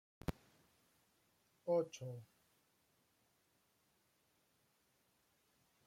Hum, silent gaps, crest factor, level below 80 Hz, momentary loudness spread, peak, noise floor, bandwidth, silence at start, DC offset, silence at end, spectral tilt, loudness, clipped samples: none; none; 24 dB; -68 dBFS; 16 LU; -26 dBFS; -79 dBFS; 16.5 kHz; 0.3 s; under 0.1%; 3.6 s; -6.5 dB/octave; -43 LUFS; under 0.1%